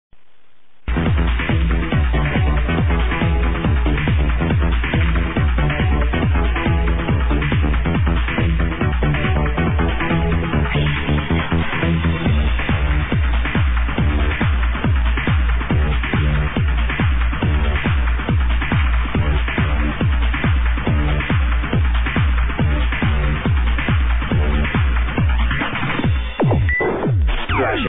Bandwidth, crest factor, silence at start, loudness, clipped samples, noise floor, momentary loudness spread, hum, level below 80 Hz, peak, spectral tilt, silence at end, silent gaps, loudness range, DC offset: 3.9 kHz; 8 dB; 0.1 s; -19 LUFS; under 0.1%; -60 dBFS; 1 LU; none; -20 dBFS; -8 dBFS; -10.5 dB/octave; 0 s; none; 1 LU; 2%